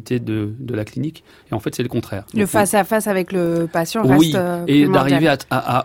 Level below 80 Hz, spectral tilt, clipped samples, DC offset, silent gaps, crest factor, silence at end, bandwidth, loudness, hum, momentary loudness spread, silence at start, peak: -50 dBFS; -5.5 dB/octave; under 0.1%; under 0.1%; none; 16 dB; 0 s; 17 kHz; -18 LUFS; none; 12 LU; 0.05 s; -2 dBFS